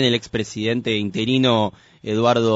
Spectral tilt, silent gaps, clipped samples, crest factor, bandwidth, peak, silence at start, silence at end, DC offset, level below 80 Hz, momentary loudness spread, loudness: -4 dB/octave; none; under 0.1%; 16 dB; 8 kHz; -4 dBFS; 0 s; 0 s; under 0.1%; -54 dBFS; 9 LU; -20 LUFS